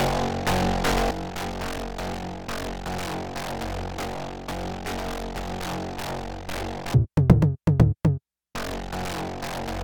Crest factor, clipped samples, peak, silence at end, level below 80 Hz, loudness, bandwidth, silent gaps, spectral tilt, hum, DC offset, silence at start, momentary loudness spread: 24 dB; under 0.1%; -2 dBFS; 0 s; -36 dBFS; -27 LUFS; 19 kHz; none; -6 dB/octave; none; 0.4%; 0 s; 12 LU